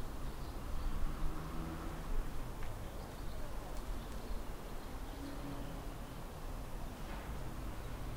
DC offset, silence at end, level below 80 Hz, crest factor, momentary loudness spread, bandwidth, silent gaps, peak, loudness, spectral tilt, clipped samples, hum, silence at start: under 0.1%; 0 s; -44 dBFS; 16 dB; 4 LU; 16 kHz; none; -24 dBFS; -47 LUFS; -5.5 dB/octave; under 0.1%; none; 0 s